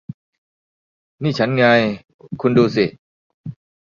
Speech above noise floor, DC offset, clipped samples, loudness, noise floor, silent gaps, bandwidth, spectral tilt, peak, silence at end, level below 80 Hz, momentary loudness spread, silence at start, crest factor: over 74 dB; under 0.1%; under 0.1%; -17 LUFS; under -90 dBFS; 0.14-1.18 s, 2.14-2.19 s, 2.99-3.44 s; 7.2 kHz; -7 dB/octave; -2 dBFS; 0.35 s; -56 dBFS; 22 LU; 0.1 s; 18 dB